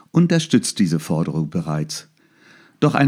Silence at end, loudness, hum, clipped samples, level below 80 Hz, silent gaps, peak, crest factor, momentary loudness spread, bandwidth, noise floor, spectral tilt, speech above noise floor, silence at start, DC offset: 0 s; -20 LUFS; none; under 0.1%; -56 dBFS; none; 0 dBFS; 18 dB; 8 LU; 15 kHz; -52 dBFS; -5.5 dB/octave; 33 dB; 0.15 s; under 0.1%